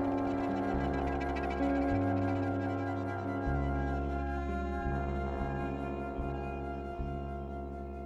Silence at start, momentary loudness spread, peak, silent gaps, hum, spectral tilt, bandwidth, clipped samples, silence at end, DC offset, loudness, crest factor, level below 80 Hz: 0 s; 8 LU; -20 dBFS; none; none; -8.5 dB/octave; 8 kHz; under 0.1%; 0 s; under 0.1%; -35 LUFS; 14 dB; -40 dBFS